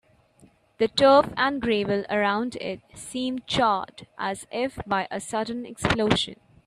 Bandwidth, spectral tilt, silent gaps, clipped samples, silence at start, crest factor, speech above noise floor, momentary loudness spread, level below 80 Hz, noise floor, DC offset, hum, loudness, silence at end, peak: 13 kHz; -4.5 dB/octave; none; under 0.1%; 0.8 s; 22 dB; 33 dB; 13 LU; -52 dBFS; -58 dBFS; under 0.1%; none; -25 LUFS; 0.3 s; -4 dBFS